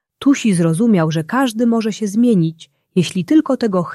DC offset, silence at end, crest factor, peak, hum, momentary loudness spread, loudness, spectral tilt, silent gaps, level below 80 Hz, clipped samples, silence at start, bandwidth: under 0.1%; 0 s; 12 dB; -2 dBFS; none; 5 LU; -16 LUFS; -6.5 dB/octave; none; -62 dBFS; under 0.1%; 0.2 s; 12.5 kHz